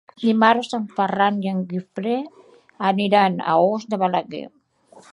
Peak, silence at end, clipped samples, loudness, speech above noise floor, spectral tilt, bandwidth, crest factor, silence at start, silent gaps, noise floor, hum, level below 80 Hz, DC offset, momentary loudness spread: -2 dBFS; 0.1 s; under 0.1%; -20 LUFS; 31 dB; -6.5 dB/octave; 11 kHz; 20 dB; 0.2 s; none; -51 dBFS; none; -70 dBFS; under 0.1%; 11 LU